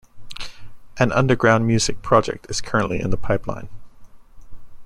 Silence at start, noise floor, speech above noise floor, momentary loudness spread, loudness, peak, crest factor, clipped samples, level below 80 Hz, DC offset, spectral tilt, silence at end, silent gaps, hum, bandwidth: 0.15 s; -40 dBFS; 21 dB; 19 LU; -20 LUFS; -2 dBFS; 20 dB; under 0.1%; -38 dBFS; under 0.1%; -5 dB/octave; 0 s; none; none; 12 kHz